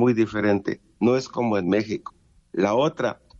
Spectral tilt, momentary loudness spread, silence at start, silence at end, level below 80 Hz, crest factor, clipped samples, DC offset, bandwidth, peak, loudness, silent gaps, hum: -6.5 dB/octave; 11 LU; 0 s; 0.25 s; -60 dBFS; 16 dB; under 0.1%; under 0.1%; 7.8 kHz; -8 dBFS; -24 LUFS; none; none